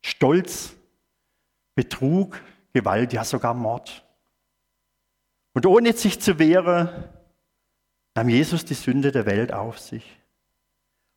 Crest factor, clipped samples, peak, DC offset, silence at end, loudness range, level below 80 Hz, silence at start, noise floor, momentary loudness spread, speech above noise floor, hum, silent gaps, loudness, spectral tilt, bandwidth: 20 dB; under 0.1%; -4 dBFS; under 0.1%; 1.15 s; 5 LU; -56 dBFS; 0.05 s; -76 dBFS; 16 LU; 55 dB; none; none; -22 LUFS; -5.5 dB/octave; 18 kHz